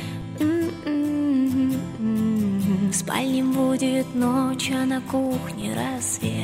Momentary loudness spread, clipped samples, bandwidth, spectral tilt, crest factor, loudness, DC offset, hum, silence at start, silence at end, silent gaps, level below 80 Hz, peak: 5 LU; under 0.1%; 16 kHz; -5 dB/octave; 14 dB; -23 LUFS; under 0.1%; none; 0 s; 0 s; none; -54 dBFS; -8 dBFS